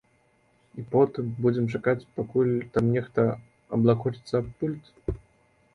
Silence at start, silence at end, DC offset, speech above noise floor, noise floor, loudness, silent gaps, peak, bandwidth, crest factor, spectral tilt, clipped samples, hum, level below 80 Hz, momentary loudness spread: 0.75 s; 0.6 s; under 0.1%; 40 dB; -65 dBFS; -27 LUFS; none; -8 dBFS; 10.5 kHz; 20 dB; -9.5 dB/octave; under 0.1%; none; -50 dBFS; 12 LU